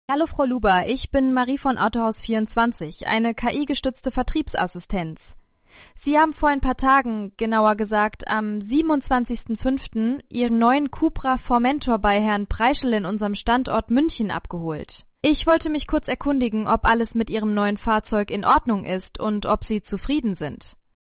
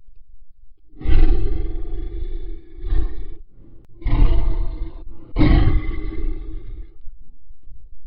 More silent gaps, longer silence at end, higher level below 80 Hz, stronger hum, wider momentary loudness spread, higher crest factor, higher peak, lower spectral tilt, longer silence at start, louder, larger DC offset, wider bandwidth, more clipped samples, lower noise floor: neither; first, 0.5 s vs 0 s; second, -38 dBFS vs -20 dBFS; neither; second, 8 LU vs 20 LU; about the same, 16 dB vs 16 dB; second, -6 dBFS vs -2 dBFS; second, -10 dB/octave vs -11.5 dB/octave; about the same, 0.1 s vs 0 s; about the same, -22 LUFS vs -24 LUFS; neither; second, 4 kHz vs 4.7 kHz; neither; first, -52 dBFS vs -38 dBFS